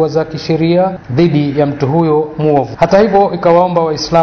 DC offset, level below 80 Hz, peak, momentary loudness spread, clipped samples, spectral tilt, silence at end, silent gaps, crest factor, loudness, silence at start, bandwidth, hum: under 0.1%; -42 dBFS; 0 dBFS; 5 LU; 0.2%; -7 dB/octave; 0 s; none; 12 dB; -12 LUFS; 0 s; 6.8 kHz; none